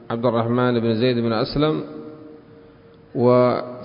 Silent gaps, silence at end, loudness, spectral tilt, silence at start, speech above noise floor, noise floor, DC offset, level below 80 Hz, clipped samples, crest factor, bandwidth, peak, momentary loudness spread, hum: none; 0 s; -20 LUFS; -12 dB/octave; 0.1 s; 28 dB; -47 dBFS; under 0.1%; -50 dBFS; under 0.1%; 16 dB; 5.4 kHz; -4 dBFS; 16 LU; none